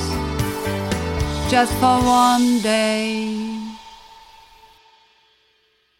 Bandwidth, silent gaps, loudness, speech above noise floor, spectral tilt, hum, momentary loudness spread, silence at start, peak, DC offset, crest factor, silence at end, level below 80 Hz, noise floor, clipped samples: 17 kHz; none; -19 LUFS; 46 dB; -4.5 dB/octave; none; 13 LU; 0 s; -4 dBFS; under 0.1%; 16 dB; 1.8 s; -36 dBFS; -62 dBFS; under 0.1%